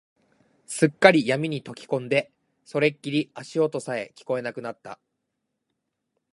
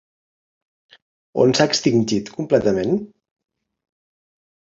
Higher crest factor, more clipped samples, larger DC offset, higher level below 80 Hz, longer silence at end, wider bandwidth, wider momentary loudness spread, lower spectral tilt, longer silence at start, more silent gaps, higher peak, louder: first, 26 dB vs 20 dB; neither; neither; second, -74 dBFS vs -56 dBFS; second, 1.4 s vs 1.6 s; first, 11.5 kHz vs 7.8 kHz; first, 18 LU vs 8 LU; about the same, -5 dB/octave vs -5 dB/octave; second, 0.7 s vs 1.35 s; neither; about the same, 0 dBFS vs -2 dBFS; second, -24 LUFS vs -19 LUFS